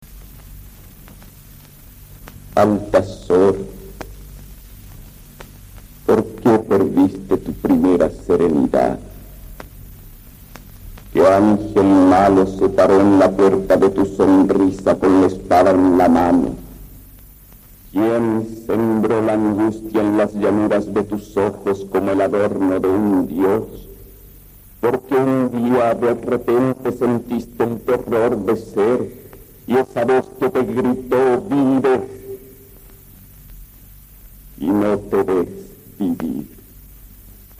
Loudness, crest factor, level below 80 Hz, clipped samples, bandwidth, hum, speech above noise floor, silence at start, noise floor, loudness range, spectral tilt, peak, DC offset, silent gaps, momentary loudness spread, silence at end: -17 LUFS; 14 dB; -42 dBFS; under 0.1%; 15.5 kHz; none; 26 dB; 0 s; -43 dBFS; 9 LU; -7.5 dB/octave; -2 dBFS; under 0.1%; none; 13 LU; 0.25 s